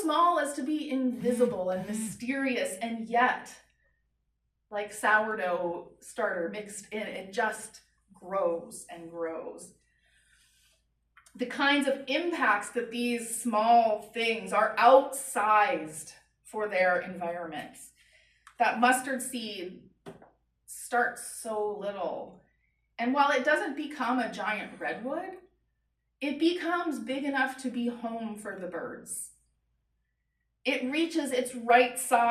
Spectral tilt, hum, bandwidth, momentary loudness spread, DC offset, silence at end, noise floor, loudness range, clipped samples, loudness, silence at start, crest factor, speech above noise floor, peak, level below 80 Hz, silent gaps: -3 dB/octave; none; 14.5 kHz; 17 LU; under 0.1%; 0 s; -79 dBFS; 10 LU; under 0.1%; -29 LUFS; 0 s; 22 dB; 50 dB; -8 dBFS; -72 dBFS; none